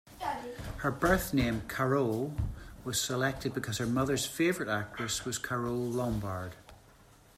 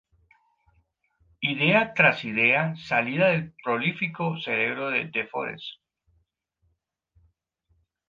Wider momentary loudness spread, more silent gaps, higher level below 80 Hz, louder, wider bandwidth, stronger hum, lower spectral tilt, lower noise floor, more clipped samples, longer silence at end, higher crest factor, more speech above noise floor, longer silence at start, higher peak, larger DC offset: about the same, 10 LU vs 11 LU; neither; first, -48 dBFS vs -68 dBFS; second, -32 LUFS vs -24 LUFS; first, 16 kHz vs 7.4 kHz; neither; second, -4.5 dB/octave vs -7 dB/octave; second, -59 dBFS vs -74 dBFS; neither; second, 0.6 s vs 2.35 s; about the same, 20 dB vs 22 dB; second, 27 dB vs 49 dB; second, 0.05 s vs 1.4 s; second, -14 dBFS vs -4 dBFS; neither